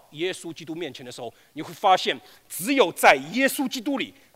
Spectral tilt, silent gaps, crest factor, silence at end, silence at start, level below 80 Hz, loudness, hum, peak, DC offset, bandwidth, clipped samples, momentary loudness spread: -3 dB/octave; none; 22 dB; 0.25 s; 0.15 s; -68 dBFS; -23 LUFS; none; -2 dBFS; under 0.1%; 16 kHz; under 0.1%; 20 LU